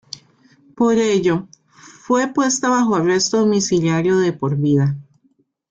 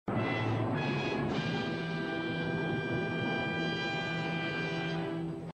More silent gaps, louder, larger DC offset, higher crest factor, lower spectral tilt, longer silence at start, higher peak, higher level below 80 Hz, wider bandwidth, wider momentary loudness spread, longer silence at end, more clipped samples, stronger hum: neither; first, -17 LUFS vs -33 LUFS; neither; about the same, 14 dB vs 14 dB; second, -5 dB/octave vs -6.5 dB/octave; first, 0.75 s vs 0.05 s; first, -4 dBFS vs -20 dBFS; about the same, -58 dBFS vs -60 dBFS; about the same, 9.6 kHz vs 9.2 kHz; first, 6 LU vs 3 LU; first, 0.7 s vs 0.05 s; neither; neither